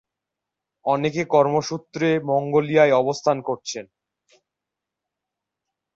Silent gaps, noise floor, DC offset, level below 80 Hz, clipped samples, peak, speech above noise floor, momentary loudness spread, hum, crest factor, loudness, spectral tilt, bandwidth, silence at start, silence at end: none; -85 dBFS; under 0.1%; -66 dBFS; under 0.1%; -4 dBFS; 65 dB; 13 LU; none; 20 dB; -21 LUFS; -5.5 dB/octave; 7.8 kHz; 0.85 s; 2.1 s